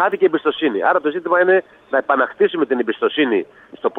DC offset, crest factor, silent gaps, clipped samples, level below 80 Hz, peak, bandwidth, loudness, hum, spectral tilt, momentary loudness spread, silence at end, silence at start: under 0.1%; 14 dB; none; under 0.1%; -68 dBFS; -4 dBFS; 4 kHz; -18 LUFS; none; -7 dB/octave; 6 LU; 0 s; 0 s